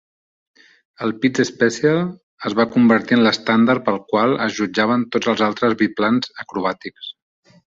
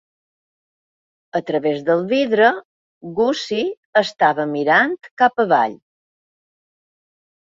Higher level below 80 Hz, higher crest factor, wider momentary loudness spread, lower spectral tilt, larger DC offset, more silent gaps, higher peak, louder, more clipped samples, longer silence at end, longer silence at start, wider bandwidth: first, -60 dBFS vs -66 dBFS; about the same, 18 dB vs 18 dB; about the same, 12 LU vs 10 LU; about the same, -5.5 dB/octave vs -5 dB/octave; neither; second, 2.23-2.37 s vs 2.65-3.01 s, 3.77-3.93 s, 5.11-5.17 s; about the same, -2 dBFS vs -2 dBFS; about the same, -18 LUFS vs -18 LUFS; neither; second, 0.6 s vs 1.85 s; second, 1 s vs 1.35 s; about the same, 7.6 kHz vs 7.8 kHz